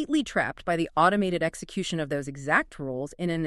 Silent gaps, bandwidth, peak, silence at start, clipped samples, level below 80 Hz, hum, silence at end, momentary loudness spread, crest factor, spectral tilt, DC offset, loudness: none; 12.5 kHz; -8 dBFS; 0 s; under 0.1%; -54 dBFS; none; 0 s; 10 LU; 20 dB; -5 dB/octave; under 0.1%; -27 LUFS